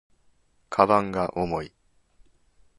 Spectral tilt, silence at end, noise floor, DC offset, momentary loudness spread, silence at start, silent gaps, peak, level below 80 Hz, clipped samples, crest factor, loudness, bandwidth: -7 dB/octave; 1.1 s; -63 dBFS; under 0.1%; 12 LU; 0.7 s; none; -2 dBFS; -54 dBFS; under 0.1%; 26 dB; -24 LUFS; 11.5 kHz